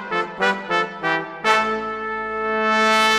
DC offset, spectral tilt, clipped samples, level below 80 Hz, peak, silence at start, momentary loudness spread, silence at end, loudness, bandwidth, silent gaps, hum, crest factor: under 0.1%; -3 dB/octave; under 0.1%; -56 dBFS; -2 dBFS; 0 s; 9 LU; 0 s; -20 LUFS; 16 kHz; none; none; 20 dB